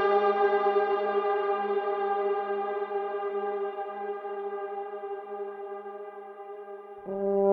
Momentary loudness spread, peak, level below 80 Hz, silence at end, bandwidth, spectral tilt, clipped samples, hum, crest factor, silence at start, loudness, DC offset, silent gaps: 17 LU; -12 dBFS; -76 dBFS; 0 s; 4.7 kHz; -7.5 dB/octave; under 0.1%; none; 18 dB; 0 s; -30 LUFS; under 0.1%; none